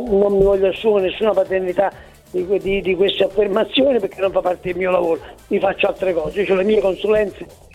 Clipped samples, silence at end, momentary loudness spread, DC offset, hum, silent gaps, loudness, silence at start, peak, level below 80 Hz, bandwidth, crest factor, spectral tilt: under 0.1%; 0.25 s; 6 LU; under 0.1%; none; none; -18 LUFS; 0 s; -2 dBFS; -42 dBFS; 13 kHz; 16 dB; -6.5 dB/octave